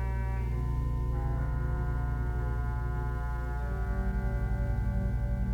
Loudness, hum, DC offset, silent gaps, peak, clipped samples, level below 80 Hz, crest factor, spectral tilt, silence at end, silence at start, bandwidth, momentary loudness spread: -33 LUFS; none; under 0.1%; none; -20 dBFS; under 0.1%; -32 dBFS; 10 dB; -9 dB/octave; 0 s; 0 s; 3.8 kHz; 3 LU